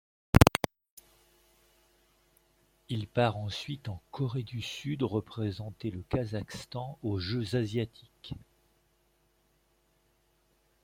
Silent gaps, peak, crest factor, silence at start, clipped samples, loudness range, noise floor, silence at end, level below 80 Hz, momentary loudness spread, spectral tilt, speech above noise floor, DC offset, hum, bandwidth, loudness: 0.90-0.97 s; -2 dBFS; 32 dB; 0.35 s; under 0.1%; 6 LU; -71 dBFS; 2.45 s; -46 dBFS; 15 LU; -6 dB/octave; 37 dB; under 0.1%; none; 16.5 kHz; -32 LUFS